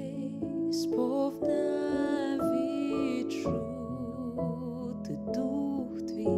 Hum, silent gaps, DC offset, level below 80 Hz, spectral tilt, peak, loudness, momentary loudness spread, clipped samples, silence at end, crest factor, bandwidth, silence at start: none; none; under 0.1%; -58 dBFS; -7 dB/octave; -16 dBFS; -32 LUFS; 7 LU; under 0.1%; 0 s; 14 dB; 14.5 kHz; 0 s